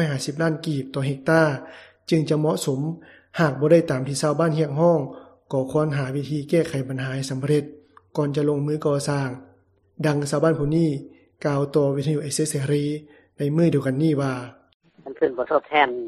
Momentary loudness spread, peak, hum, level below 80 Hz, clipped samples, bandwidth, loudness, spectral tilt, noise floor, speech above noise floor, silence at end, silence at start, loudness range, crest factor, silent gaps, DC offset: 12 LU; -2 dBFS; none; -58 dBFS; under 0.1%; 13.5 kHz; -23 LUFS; -6.5 dB/octave; -58 dBFS; 36 dB; 0 s; 0 s; 3 LU; 20 dB; 14.74-14.80 s; under 0.1%